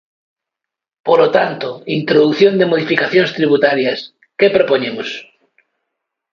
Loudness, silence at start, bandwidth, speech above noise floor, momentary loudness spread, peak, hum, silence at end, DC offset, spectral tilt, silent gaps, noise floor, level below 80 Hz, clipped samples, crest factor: -14 LUFS; 1.05 s; 7 kHz; 70 dB; 13 LU; 0 dBFS; none; 1.1 s; under 0.1%; -6.5 dB/octave; none; -83 dBFS; -60 dBFS; under 0.1%; 16 dB